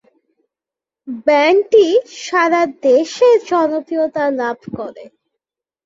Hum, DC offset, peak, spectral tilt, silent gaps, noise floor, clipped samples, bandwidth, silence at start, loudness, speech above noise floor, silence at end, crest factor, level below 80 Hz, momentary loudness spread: none; under 0.1%; -2 dBFS; -4 dB/octave; none; -88 dBFS; under 0.1%; 7.8 kHz; 1.05 s; -14 LUFS; 73 dB; 0.8 s; 14 dB; -62 dBFS; 15 LU